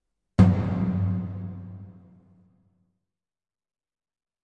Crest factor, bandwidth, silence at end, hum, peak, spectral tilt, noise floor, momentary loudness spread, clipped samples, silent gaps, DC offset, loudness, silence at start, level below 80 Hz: 22 dB; 6.4 kHz; 2.55 s; none; -6 dBFS; -9.5 dB/octave; -87 dBFS; 21 LU; under 0.1%; none; under 0.1%; -24 LUFS; 0.4 s; -48 dBFS